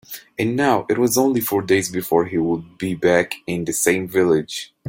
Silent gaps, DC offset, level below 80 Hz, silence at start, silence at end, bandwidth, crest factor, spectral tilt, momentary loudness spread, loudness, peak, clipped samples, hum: none; under 0.1%; -56 dBFS; 0.1 s; 0 s; 17 kHz; 18 dB; -4.5 dB/octave; 7 LU; -19 LUFS; -2 dBFS; under 0.1%; none